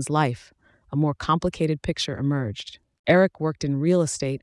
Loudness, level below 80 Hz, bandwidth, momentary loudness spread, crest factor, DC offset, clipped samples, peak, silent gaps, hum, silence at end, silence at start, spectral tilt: -24 LUFS; -50 dBFS; 12 kHz; 12 LU; 18 dB; under 0.1%; under 0.1%; -6 dBFS; 2.99-3.04 s; none; 0.05 s; 0 s; -5.5 dB/octave